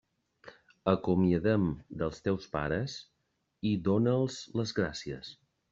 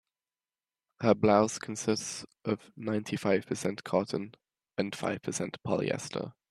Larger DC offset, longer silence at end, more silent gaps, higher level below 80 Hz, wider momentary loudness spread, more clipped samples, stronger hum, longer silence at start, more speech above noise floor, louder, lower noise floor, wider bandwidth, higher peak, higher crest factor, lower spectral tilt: neither; first, 0.4 s vs 0.2 s; neither; first, -58 dBFS vs -70 dBFS; about the same, 12 LU vs 12 LU; neither; neither; second, 0.45 s vs 1 s; second, 49 dB vs over 59 dB; about the same, -31 LUFS vs -31 LUFS; second, -79 dBFS vs under -90 dBFS; second, 7.6 kHz vs 13 kHz; about the same, -10 dBFS vs -8 dBFS; about the same, 22 dB vs 24 dB; first, -7 dB/octave vs -5 dB/octave